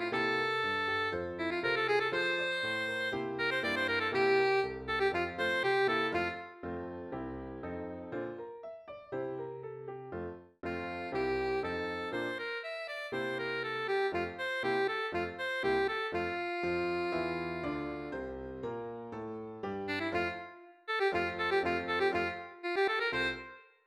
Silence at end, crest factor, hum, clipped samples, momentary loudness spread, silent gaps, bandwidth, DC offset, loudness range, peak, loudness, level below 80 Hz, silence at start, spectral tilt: 0.25 s; 18 dB; none; under 0.1%; 12 LU; none; 12.5 kHz; under 0.1%; 10 LU; -18 dBFS; -34 LUFS; -62 dBFS; 0 s; -5 dB/octave